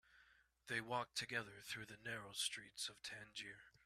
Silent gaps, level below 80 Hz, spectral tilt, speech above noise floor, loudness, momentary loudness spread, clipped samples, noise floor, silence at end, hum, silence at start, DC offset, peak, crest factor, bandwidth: none; -80 dBFS; -2 dB/octave; 25 dB; -47 LUFS; 9 LU; under 0.1%; -73 dBFS; 0.15 s; none; 0.1 s; under 0.1%; -28 dBFS; 22 dB; 15 kHz